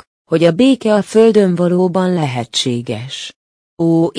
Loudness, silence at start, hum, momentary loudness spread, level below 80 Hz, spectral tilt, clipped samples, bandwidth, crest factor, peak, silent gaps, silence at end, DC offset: -14 LUFS; 0.3 s; none; 13 LU; -58 dBFS; -6 dB/octave; under 0.1%; 10.5 kHz; 14 dB; 0 dBFS; 3.36-3.77 s; 0 s; under 0.1%